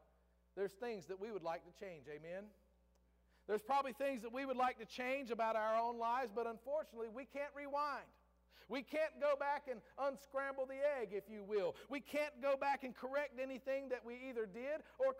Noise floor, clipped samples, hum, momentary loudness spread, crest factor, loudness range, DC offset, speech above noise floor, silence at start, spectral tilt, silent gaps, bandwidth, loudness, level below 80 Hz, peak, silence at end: -75 dBFS; under 0.1%; 60 Hz at -75 dBFS; 11 LU; 14 dB; 4 LU; under 0.1%; 32 dB; 0.55 s; -4.5 dB/octave; none; 16 kHz; -43 LUFS; -76 dBFS; -28 dBFS; 0 s